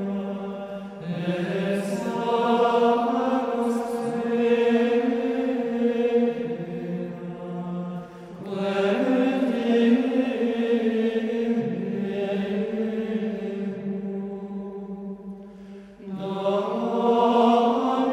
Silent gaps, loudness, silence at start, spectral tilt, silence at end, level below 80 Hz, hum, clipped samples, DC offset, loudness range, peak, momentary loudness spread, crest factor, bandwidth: none; -24 LUFS; 0 s; -7 dB/octave; 0 s; -64 dBFS; none; under 0.1%; under 0.1%; 7 LU; -6 dBFS; 15 LU; 18 dB; 12 kHz